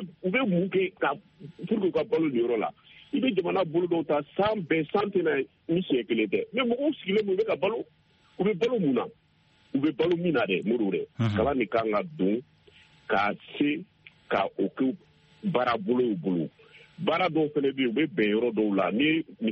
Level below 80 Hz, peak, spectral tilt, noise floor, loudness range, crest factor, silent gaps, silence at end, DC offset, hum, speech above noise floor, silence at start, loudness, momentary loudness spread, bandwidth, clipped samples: -62 dBFS; -10 dBFS; -4.5 dB/octave; -63 dBFS; 2 LU; 16 dB; none; 0 s; under 0.1%; none; 37 dB; 0 s; -27 LUFS; 5 LU; 6.8 kHz; under 0.1%